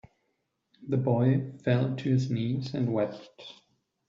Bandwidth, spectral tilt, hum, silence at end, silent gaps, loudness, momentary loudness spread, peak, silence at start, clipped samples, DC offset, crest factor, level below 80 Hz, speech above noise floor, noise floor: 7.4 kHz; -8 dB/octave; none; 0.55 s; none; -28 LUFS; 21 LU; -14 dBFS; 0.8 s; under 0.1%; under 0.1%; 16 dB; -66 dBFS; 50 dB; -78 dBFS